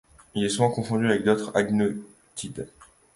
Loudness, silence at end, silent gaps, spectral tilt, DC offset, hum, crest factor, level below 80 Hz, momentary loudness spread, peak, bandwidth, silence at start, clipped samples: -25 LUFS; 0.3 s; none; -5.5 dB/octave; under 0.1%; none; 20 dB; -58 dBFS; 16 LU; -6 dBFS; 11.5 kHz; 0.35 s; under 0.1%